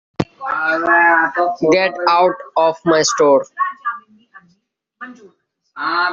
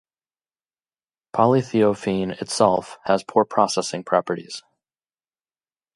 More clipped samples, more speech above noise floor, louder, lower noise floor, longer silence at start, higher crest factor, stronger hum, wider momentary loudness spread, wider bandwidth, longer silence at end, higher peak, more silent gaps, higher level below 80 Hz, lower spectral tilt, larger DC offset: neither; second, 49 dB vs over 69 dB; first, -15 LUFS vs -21 LUFS; second, -63 dBFS vs under -90 dBFS; second, 0.2 s vs 1.35 s; second, 16 dB vs 22 dB; neither; first, 16 LU vs 10 LU; second, 7.6 kHz vs 11.5 kHz; second, 0 s vs 1.35 s; about the same, -2 dBFS vs -2 dBFS; neither; about the same, -56 dBFS vs -60 dBFS; second, -2 dB/octave vs -5 dB/octave; neither